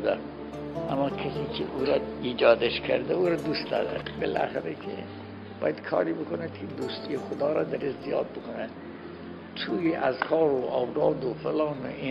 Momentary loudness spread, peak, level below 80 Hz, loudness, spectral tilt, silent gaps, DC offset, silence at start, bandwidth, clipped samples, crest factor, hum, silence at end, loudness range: 13 LU; -8 dBFS; -56 dBFS; -29 LUFS; -7 dB/octave; none; under 0.1%; 0 s; 12 kHz; under 0.1%; 22 dB; none; 0 s; 5 LU